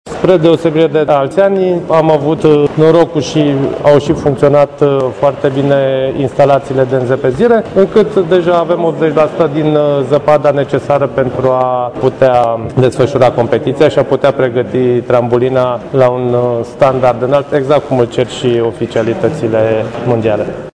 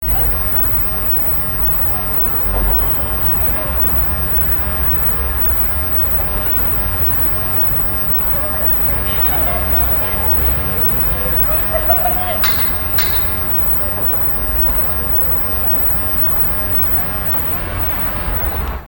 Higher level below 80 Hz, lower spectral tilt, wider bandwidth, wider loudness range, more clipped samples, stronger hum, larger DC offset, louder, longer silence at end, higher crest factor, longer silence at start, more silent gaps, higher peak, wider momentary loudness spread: second, -42 dBFS vs -24 dBFS; first, -7.5 dB/octave vs -6 dB/octave; second, 10.5 kHz vs 17.5 kHz; about the same, 2 LU vs 1 LU; first, 1% vs under 0.1%; neither; neither; about the same, -11 LUFS vs -12 LUFS; about the same, 0.05 s vs 0 s; about the same, 10 dB vs 14 dB; about the same, 0.05 s vs 0 s; neither; about the same, 0 dBFS vs 0 dBFS; about the same, 4 LU vs 2 LU